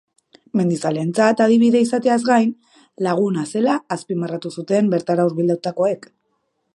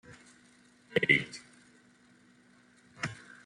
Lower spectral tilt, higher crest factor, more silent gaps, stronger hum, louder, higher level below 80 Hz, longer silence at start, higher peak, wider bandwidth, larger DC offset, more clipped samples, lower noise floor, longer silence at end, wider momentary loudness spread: first, -6.5 dB/octave vs -4.5 dB/octave; second, 18 dB vs 26 dB; neither; neither; first, -19 LUFS vs -30 LUFS; about the same, -70 dBFS vs -70 dBFS; first, 0.55 s vs 0.1 s; first, -2 dBFS vs -10 dBFS; about the same, 11.5 kHz vs 11.5 kHz; neither; neither; first, -70 dBFS vs -62 dBFS; first, 0.8 s vs 0.3 s; second, 10 LU vs 18 LU